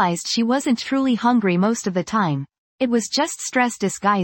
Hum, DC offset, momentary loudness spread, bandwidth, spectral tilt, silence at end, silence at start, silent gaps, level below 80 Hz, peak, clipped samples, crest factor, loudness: none; under 0.1%; 5 LU; 17 kHz; -4.5 dB/octave; 0 s; 0 s; 2.58-2.78 s; -62 dBFS; -4 dBFS; under 0.1%; 16 dB; -20 LUFS